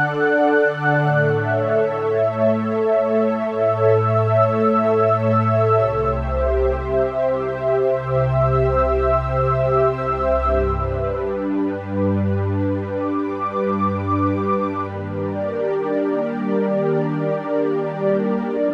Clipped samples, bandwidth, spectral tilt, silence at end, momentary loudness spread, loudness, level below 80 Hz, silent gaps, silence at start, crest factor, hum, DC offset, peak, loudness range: under 0.1%; 7 kHz; -9.5 dB/octave; 0 s; 6 LU; -19 LUFS; -34 dBFS; none; 0 s; 14 dB; none; under 0.1%; -4 dBFS; 4 LU